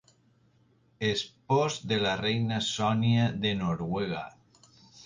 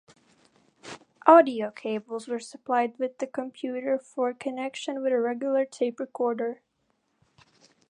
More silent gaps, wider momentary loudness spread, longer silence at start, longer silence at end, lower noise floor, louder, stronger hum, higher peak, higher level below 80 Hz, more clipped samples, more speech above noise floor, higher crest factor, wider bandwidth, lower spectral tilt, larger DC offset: neither; second, 7 LU vs 16 LU; first, 1 s vs 0.85 s; second, 0 s vs 1.4 s; second, -65 dBFS vs -74 dBFS; about the same, -29 LUFS vs -27 LUFS; neither; second, -14 dBFS vs -2 dBFS; first, -58 dBFS vs -82 dBFS; neither; second, 37 dB vs 48 dB; second, 16 dB vs 26 dB; about the same, 9.8 kHz vs 10.5 kHz; about the same, -5.5 dB/octave vs -4.5 dB/octave; neither